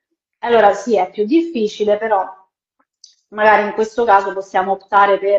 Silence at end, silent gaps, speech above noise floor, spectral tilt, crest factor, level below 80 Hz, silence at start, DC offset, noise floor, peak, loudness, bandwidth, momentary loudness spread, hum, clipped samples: 0 s; none; 53 dB; -5 dB/octave; 16 dB; -58 dBFS; 0.45 s; under 0.1%; -68 dBFS; 0 dBFS; -15 LUFS; 8 kHz; 7 LU; none; under 0.1%